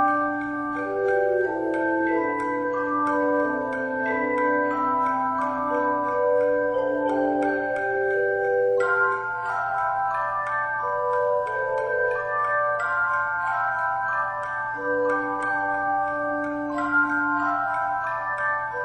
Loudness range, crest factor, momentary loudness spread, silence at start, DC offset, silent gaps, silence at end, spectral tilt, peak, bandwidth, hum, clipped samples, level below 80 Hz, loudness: 1 LU; 12 dB; 4 LU; 0 s; under 0.1%; none; 0 s; -6.5 dB/octave; -12 dBFS; 9.4 kHz; none; under 0.1%; -60 dBFS; -24 LUFS